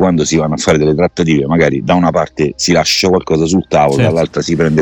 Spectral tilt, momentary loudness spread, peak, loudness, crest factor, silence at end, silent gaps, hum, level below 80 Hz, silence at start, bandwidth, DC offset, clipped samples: -5 dB/octave; 4 LU; 0 dBFS; -12 LUFS; 12 dB; 0 s; none; none; -36 dBFS; 0 s; 17.5 kHz; under 0.1%; under 0.1%